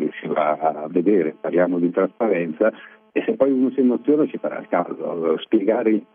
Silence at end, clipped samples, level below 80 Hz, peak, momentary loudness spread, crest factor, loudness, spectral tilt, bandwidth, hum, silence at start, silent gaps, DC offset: 0.1 s; under 0.1%; -70 dBFS; -4 dBFS; 6 LU; 18 dB; -21 LUFS; -10.5 dB/octave; 3.7 kHz; none; 0 s; none; under 0.1%